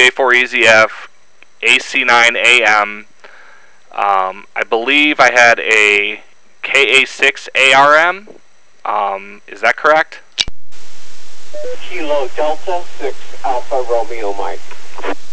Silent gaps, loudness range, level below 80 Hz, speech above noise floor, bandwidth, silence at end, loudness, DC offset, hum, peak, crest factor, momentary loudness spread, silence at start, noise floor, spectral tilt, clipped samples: none; 10 LU; -52 dBFS; 37 dB; 8 kHz; 0 s; -11 LUFS; under 0.1%; none; 0 dBFS; 14 dB; 18 LU; 0 s; -49 dBFS; -1.5 dB/octave; under 0.1%